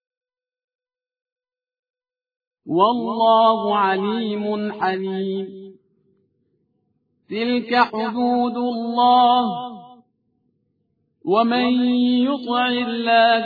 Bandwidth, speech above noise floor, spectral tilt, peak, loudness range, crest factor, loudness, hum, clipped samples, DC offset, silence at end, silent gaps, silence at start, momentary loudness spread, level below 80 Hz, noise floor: 5 kHz; 51 dB; -7.5 dB/octave; -2 dBFS; 7 LU; 20 dB; -19 LUFS; none; under 0.1%; under 0.1%; 0 s; none; 2.65 s; 10 LU; -66 dBFS; -69 dBFS